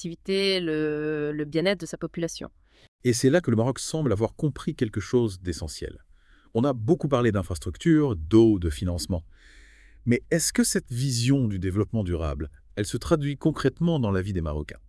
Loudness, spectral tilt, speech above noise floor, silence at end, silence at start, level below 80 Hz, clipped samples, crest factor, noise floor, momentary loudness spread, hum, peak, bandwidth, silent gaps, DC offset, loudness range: -25 LUFS; -5.5 dB/octave; 31 dB; 0.1 s; 0 s; -44 dBFS; under 0.1%; 18 dB; -56 dBFS; 11 LU; none; -8 dBFS; 12 kHz; 2.88-2.99 s; under 0.1%; 3 LU